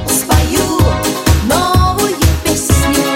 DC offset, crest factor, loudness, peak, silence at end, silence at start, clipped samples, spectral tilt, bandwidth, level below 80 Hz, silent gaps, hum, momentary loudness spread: under 0.1%; 12 dB; -12 LUFS; 0 dBFS; 0 s; 0 s; under 0.1%; -4.5 dB/octave; 17 kHz; -18 dBFS; none; none; 2 LU